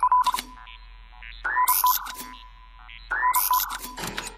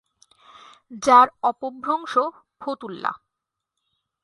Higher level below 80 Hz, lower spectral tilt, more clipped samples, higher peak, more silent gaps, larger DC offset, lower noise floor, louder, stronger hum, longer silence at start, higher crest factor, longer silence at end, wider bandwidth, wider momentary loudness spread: first, -48 dBFS vs -68 dBFS; second, 0 dB/octave vs -3 dB/octave; neither; second, -8 dBFS vs -2 dBFS; neither; neither; second, -46 dBFS vs -84 dBFS; about the same, -23 LUFS vs -21 LUFS; neither; second, 0 s vs 0.9 s; about the same, 18 dB vs 22 dB; second, 0 s vs 1.05 s; first, 16 kHz vs 11.5 kHz; first, 24 LU vs 17 LU